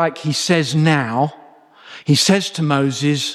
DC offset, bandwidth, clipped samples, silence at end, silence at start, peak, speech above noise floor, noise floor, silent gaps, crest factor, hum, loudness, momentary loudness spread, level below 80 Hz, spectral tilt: under 0.1%; 13.5 kHz; under 0.1%; 0 s; 0 s; -2 dBFS; 28 dB; -45 dBFS; none; 16 dB; none; -17 LUFS; 7 LU; -60 dBFS; -4.5 dB/octave